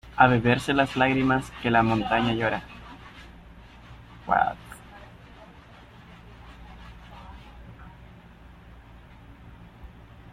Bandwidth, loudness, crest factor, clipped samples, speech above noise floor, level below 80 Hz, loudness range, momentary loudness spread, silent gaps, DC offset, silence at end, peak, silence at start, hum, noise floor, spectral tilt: 13.5 kHz; -23 LUFS; 26 dB; under 0.1%; 26 dB; -48 dBFS; 23 LU; 26 LU; none; under 0.1%; 0.45 s; -2 dBFS; 0.05 s; none; -49 dBFS; -6.5 dB/octave